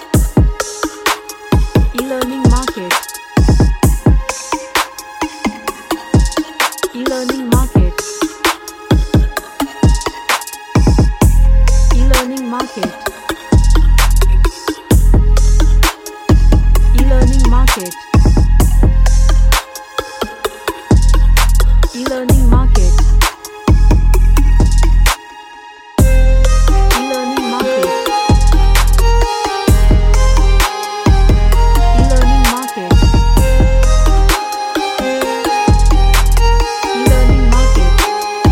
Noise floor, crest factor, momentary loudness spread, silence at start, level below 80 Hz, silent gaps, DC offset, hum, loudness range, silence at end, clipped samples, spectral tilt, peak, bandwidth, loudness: -34 dBFS; 10 dB; 8 LU; 0 s; -12 dBFS; none; under 0.1%; none; 3 LU; 0 s; under 0.1%; -5 dB/octave; 0 dBFS; 16.5 kHz; -14 LUFS